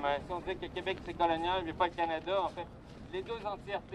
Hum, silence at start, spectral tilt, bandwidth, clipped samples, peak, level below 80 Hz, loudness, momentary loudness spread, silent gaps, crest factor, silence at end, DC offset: none; 0 s; -6 dB/octave; 11 kHz; under 0.1%; -18 dBFS; -54 dBFS; -35 LUFS; 11 LU; none; 18 dB; 0 s; under 0.1%